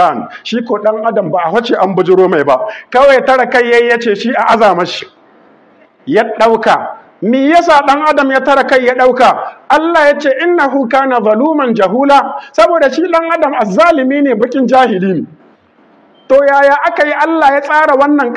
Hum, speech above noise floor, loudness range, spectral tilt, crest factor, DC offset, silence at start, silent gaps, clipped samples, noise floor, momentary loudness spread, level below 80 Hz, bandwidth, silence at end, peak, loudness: none; 37 dB; 3 LU; -5.5 dB/octave; 10 dB; under 0.1%; 0 s; none; 0.2%; -46 dBFS; 7 LU; -50 dBFS; 11 kHz; 0 s; 0 dBFS; -10 LUFS